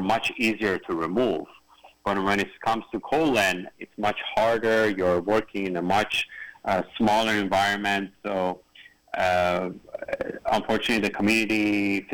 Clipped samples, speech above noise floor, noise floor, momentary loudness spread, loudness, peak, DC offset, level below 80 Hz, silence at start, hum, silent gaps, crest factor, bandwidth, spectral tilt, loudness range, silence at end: under 0.1%; 27 dB; -51 dBFS; 10 LU; -25 LUFS; -12 dBFS; under 0.1%; -54 dBFS; 0 s; none; none; 14 dB; over 20 kHz; -4.5 dB/octave; 2 LU; 0 s